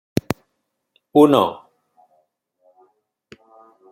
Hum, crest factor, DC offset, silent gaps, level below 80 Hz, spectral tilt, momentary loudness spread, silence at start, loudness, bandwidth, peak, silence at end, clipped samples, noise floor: none; 22 dB; under 0.1%; none; -58 dBFS; -6.5 dB/octave; 16 LU; 0.3 s; -18 LUFS; 16.5 kHz; 0 dBFS; 2.4 s; under 0.1%; -74 dBFS